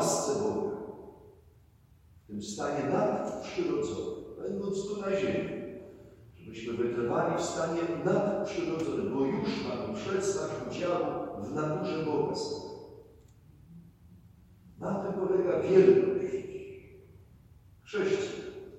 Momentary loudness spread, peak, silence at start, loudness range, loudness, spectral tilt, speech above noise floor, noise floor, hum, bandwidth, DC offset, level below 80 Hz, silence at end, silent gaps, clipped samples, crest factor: 14 LU; -8 dBFS; 0 s; 7 LU; -31 LUFS; -5.5 dB/octave; 30 dB; -60 dBFS; none; 13 kHz; under 0.1%; -62 dBFS; 0 s; none; under 0.1%; 22 dB